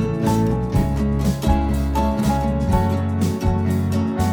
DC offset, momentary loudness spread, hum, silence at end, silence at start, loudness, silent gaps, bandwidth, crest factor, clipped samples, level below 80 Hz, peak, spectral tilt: under 0.1%; 2 LU; none; 0 s; 0 s; -20 LUFS; none; over 20 kHz; 14 dB; under 0.1%; -26 dBFS; -4 dBFS; -7.5 dB/octave